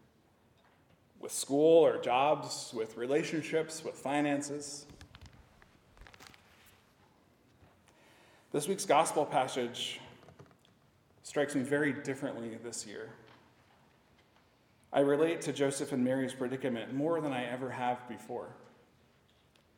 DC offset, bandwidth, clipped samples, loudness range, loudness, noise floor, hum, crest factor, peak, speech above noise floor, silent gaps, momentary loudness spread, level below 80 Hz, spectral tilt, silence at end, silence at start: under 0.1%; 17.5 kHz; under 0.1%; 9 LU; -33 LUFS; -67 dBFS; none; 22 dB; -14 dBFS; 35 dB; none; 18 LU; -74 dBFS; -4.5 dB/octave; 1.2 s; 1.25 s